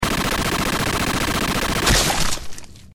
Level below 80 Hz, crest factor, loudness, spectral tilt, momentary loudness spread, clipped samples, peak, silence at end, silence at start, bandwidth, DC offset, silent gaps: -30 dBFS; 16 dB; -20 LUFS; -3 dB/octave; 10 LU; under 0.1%; -4 dBFS; 0.05 s; 0 s; over 20 kHz; under 0.1%; none